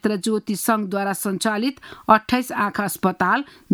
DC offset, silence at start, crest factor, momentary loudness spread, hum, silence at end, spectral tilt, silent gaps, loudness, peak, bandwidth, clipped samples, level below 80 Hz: under 0.1%; 0.05 s; 20 dB; 6 LU; none; 0 s; -4.5 dB/octave; none; -21 LUFS; -2 dBFS; over 20 kHz; under 0.1%; -58 dBFS